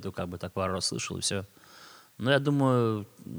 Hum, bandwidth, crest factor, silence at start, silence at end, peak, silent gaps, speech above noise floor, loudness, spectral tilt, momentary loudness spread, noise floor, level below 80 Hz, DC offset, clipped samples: none; over 20 kHz; 20 dB; 0 s; 0 s; -10 dBFS; none; 23 dB; -29 LUFS; -4.5 dB/octave; 12 LU; -52 dBFS; -64 dBFS; under 0.1%; under 0.1%